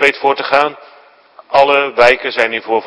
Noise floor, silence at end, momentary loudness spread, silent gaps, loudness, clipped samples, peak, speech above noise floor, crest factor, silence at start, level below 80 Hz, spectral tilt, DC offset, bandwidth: -43 dBFS; 0 s; 5 LU; none; -12 LUFS; 0.5%; 0 dBFS; 30 dB; 14 dB; 0 s; -52 dBFS; -3.5 dB/octave; under 0.1%; 11 kHz